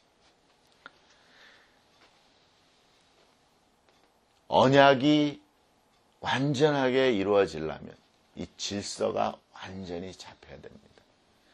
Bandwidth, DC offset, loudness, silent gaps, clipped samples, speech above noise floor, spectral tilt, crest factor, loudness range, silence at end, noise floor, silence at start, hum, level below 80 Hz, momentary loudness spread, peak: 11 kHz; under 0.1%; -26 LUFS; none; under 0.1%; 40 dB; -5 dB/octave; 24 dB; 11 LU; 0.85 s; -66 dBFS; 4.5 s; none; -64 dBFS; 27 LU; -4 dBFS